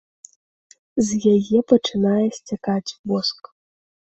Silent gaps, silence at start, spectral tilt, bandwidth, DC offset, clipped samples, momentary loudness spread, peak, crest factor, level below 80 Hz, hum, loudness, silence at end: 2.99-3.04 s; 0.95 s; -5.5 dB/octave; 8.2 kHz; under 0.1%; under 0.1%; 9 LU; -2 dBFS; 20 dB; -60 dBFS; none; -20 LUFS; 0.8 s